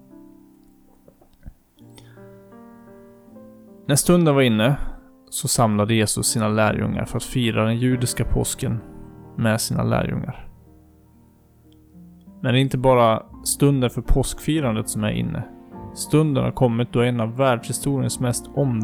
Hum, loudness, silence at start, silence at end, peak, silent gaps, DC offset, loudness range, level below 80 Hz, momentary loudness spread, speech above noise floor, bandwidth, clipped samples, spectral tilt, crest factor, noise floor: none; -21 LUFS; 1.45 s; 0 s; -6 dBFS; none; under 0.1%; 6 LU; -36 dBFS; 13 LU; 33 dB; 18 kHz; under 0.1%; -5 dB/octave; 16 dB; -53 dBFS